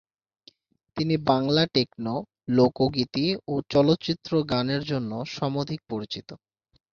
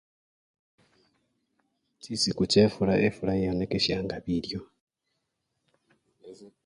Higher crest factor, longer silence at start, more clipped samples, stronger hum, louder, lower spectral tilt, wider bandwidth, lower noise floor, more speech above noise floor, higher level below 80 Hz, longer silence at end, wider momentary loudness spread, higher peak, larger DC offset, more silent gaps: about the same, 20 dB vs 22 dB; second, 0.95 s vs 2.05 s; neither; neither; about the same, -25 LUFS vs -26 LUFS; first, -7 dB/octave vs -5 dB/octave; second, 7 kHz vs 11 kHz; second, -59 dBFS vs -80 dBFS; second, 34 dB vs 54 dB; about the same, -56 dBFS vs -54 dBFS; first, 0.55 s vs 0.2 s; about the same, 11 LU vs 11 LU; about the same, -6 dBFS vs -8 dBFS; neither; second, none vs 4.81-4.87 s